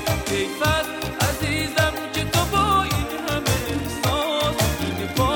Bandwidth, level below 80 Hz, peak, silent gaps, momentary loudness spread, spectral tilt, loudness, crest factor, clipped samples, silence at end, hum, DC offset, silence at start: over 20 kHz; -34 dBFS; -6 dBFS; none; 5 LU; -4 dB/octave; -22 LUFS; 16 dB; under 0.1%; 0 s; none; under 0.1%; 0 s